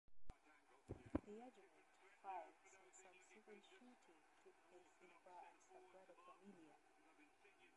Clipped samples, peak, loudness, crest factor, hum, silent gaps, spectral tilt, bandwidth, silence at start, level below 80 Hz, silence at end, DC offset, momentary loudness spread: under 0.1%; -28 dBFS; -60 LUFS; 32 dB; none; none; -6 dB/octave; 11 kHz; 0.1 s; -74 dBFS; 0 s; under 0.1%; 17 LU